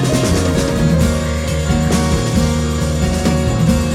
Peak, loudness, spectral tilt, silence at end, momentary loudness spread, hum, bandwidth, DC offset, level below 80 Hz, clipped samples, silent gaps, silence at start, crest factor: -2 dBFS; -16 LUFS; -5.5 dB/octave; 0 s; 3 LU; none; 16 kHz; under 0.1%; -22 dBFS; under 0.1%; none; 0 s; 12 dB